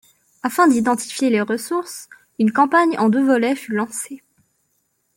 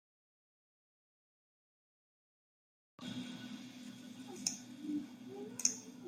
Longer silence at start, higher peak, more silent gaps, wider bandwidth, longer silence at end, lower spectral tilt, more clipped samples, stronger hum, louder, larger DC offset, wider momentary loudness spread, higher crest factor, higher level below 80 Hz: second, 0.45 s vs 3 s; first, -4 dBFS vs -14 dBFS; neither; about the same, 17 kHz vs 16 kHz; first, 1 s vs 0 s; first, -4.5 dB/octave vs -2 dB/octave; neither; neither; first, -18 LUFS vs -42 LUFS; neither; about the same, 17 LU vs 16 LU; second, 16 dB vs 32 dB; first, -66 dBFS vs -88 dBFS